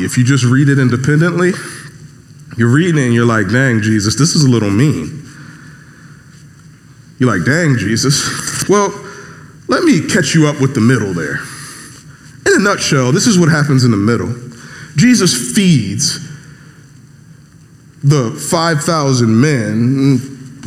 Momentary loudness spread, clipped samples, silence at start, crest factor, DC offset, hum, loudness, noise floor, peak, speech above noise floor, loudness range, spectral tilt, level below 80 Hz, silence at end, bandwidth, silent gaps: 17 LU; under 0.1%; 0 s; 14 dB; under 0.1%; none; -12 LUFS; -41 dBFS; 0 dBFS; 30 dB; 5 LU; -5 dB/octave; -50 dBFS; 0 s; 14.5 kHz; none